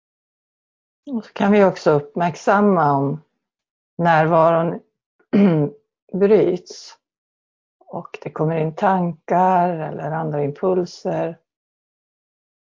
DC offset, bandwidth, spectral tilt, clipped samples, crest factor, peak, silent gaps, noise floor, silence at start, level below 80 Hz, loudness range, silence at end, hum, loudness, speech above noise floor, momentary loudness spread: under 0.1%; 7.6 kHz; -8 dB/octave; under 0.1%; 18 dB; -2 dBFS; 3.70-3.97 s, 5.06-5.19 s, 6.02-6.07 s, 7.18-7.80 s; under -90 dBFS; 1.05 s; -62 dBFS; 4 LU; 1.3 s; none; -19 LUFS; over 72 dB; 16 LU